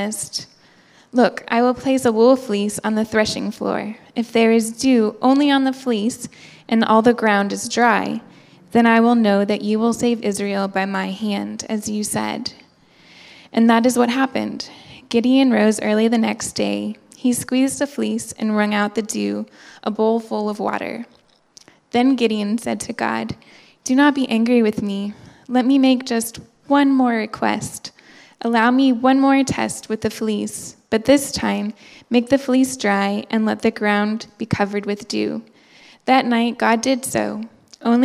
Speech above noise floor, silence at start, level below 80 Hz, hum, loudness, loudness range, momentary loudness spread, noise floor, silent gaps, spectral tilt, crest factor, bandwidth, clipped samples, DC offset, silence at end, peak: 33 dB; 0 s; -56 dBFS; none; -19 LUFS; 4 LU; 12 LU; -51 dBFS; none; -4.5 dB/octave; 18 dB; 14.5 kHz; under 0.1%; under 0.1%; 0 s; 0 dBFS